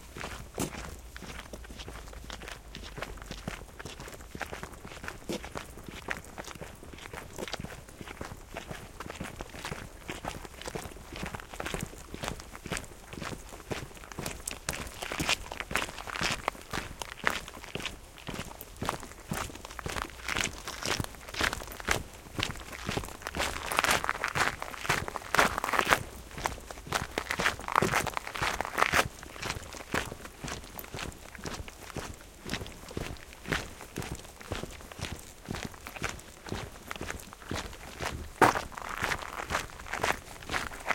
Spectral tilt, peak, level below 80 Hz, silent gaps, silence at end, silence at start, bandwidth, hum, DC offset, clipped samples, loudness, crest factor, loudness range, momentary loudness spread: -3 dB/octave; 0 dBFS; -48 dBFS; none; 0 s; 0 s; 17 kHz; none; under 0.1%; under 0.1%; -35 LUFS; 34 dB; 12 LU; 15 LU